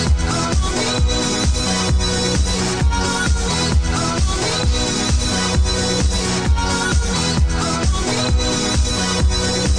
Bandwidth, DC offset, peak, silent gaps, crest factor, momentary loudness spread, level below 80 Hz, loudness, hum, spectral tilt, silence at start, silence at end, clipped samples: 10 kHz; under 0.1%; -6 dBFS; none; 12 dB; 1 LU; -20 dBFS; -18 LUFS; none; -4 dB/octave; 0 s; 0 s; under 0.1%